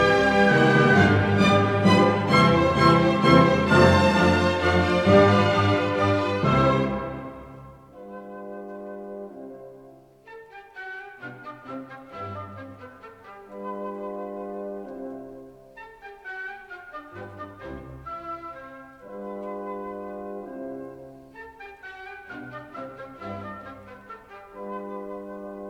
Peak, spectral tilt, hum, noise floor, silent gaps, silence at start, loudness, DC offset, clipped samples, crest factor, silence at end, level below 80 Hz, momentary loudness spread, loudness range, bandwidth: -4 dBFS; -6.5 dB/octave; none; -50 dBFS; none; 0 s; -20 LUFS; under 0.1%; under 0.1%; 20 dB; 0 s; -48 dBFS; 25 LU; 21 LU; 12.5 kHz